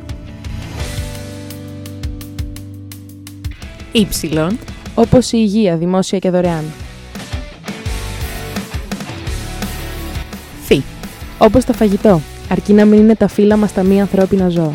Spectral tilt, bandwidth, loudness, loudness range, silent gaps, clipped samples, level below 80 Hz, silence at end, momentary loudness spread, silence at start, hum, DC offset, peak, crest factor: -6.5 dB/octave; 17 kHz; -14 LUFS; 13 LU; none; 0.3%; -30 dBFS; 0 s; 18 LU; 0 s; none; under 0.1%; 0 dBFS; 16 dB